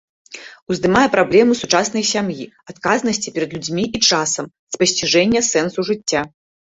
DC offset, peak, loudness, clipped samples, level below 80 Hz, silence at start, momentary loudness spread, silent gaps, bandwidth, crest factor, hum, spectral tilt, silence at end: under 0.1%; -2 dBFS; -17 LUFS; under 0.1%; -52 dBFS; 0.3 s; 17 LU; 0.62-0.67 s, 4.59-4.67 s; 8 kHz; 16 dB; none; -3 dB/octave; 0.45 s